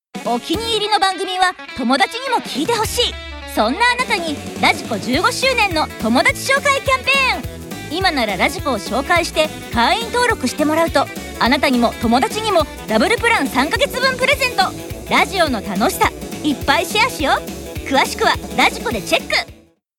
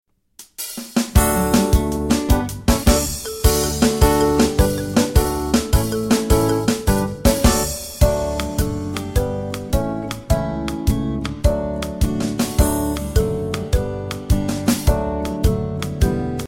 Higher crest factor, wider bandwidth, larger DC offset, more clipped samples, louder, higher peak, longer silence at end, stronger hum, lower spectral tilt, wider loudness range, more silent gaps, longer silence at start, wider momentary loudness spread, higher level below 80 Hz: about the same, 16 dB vs 18 dB; about the same, 18 kHz vs 17 kHz; neither; neither; first, -16 LUFS vs -19 LUFS; about the same, 0 dBFS vs -2 dBFS; first, 0.45 s vs 0 s; neither; second, -3.5 dB/octave vs -5.5 dB/octave; second, 2 LU vs 5 LU; neither; second, 0.15 s vs 0.4 s; about the same, 6 LU vs 8 LU; second, -38 dBFS vs -24 dBFS